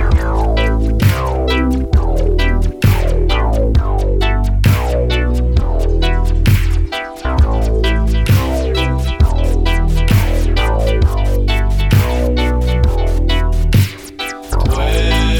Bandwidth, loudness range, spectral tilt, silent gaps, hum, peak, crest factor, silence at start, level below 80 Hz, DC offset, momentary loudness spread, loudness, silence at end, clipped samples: 19 kHz; 1 LU; -6.5 dB/octave; none; none; 0 dBFS; 12 dB; 0 s; -14 dBFS; 0.4%; 3 LU; -15 LUFS; 0 s; under 0.1%